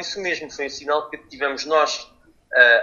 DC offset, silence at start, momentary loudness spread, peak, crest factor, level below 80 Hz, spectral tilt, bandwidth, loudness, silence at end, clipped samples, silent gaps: under 0.1%; 0 s; 14 LU; 0 dBFS; 20 dB; -60 dBFS; -1 dB/octave; 7.4 kHz; -21 LUFS; 0 s; under 0.1%; none